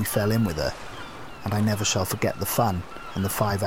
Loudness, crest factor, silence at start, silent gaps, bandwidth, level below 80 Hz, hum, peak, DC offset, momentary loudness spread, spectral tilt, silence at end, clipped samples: -25 LUFS; 16 dB; 0 s; none; 17 kHz; -46 dBFS; none; -10 dBFS; 0.8%; 14 LU; -4.5 dB/octave; 0 s; under 0.1%